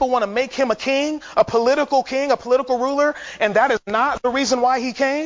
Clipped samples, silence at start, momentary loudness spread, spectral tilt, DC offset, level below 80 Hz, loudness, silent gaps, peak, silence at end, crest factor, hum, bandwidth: under 0.1%; 0 s; 4 LU; -3.5 dB/octave; under 0.1%; -52 dBFS; -19 LUFS; none; -2 dBFS; 0 s; 16 dB; none; 7.6 kHz